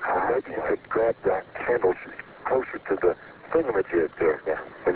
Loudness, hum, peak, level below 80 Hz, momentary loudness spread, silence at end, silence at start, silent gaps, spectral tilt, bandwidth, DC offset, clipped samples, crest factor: -26 LUFS; none; -10 dBFS; -56 dBFS; 6 LU; 0 s; 0 s; none; -10 dB/octave; 4 kHz; under 0.1%; under 0.1%; 16 dB